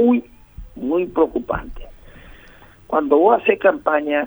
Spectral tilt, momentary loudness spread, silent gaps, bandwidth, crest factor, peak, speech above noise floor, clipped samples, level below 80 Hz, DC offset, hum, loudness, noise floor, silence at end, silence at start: -8 dB/octave; 12 LU; none; over 20 kHz; 18 dB; -2 dBFS; 28 dB; under 0.1%; -42 dBFS; under 0.1%; none; -18 LUFS; -45 dBFS; 0 s; 0 s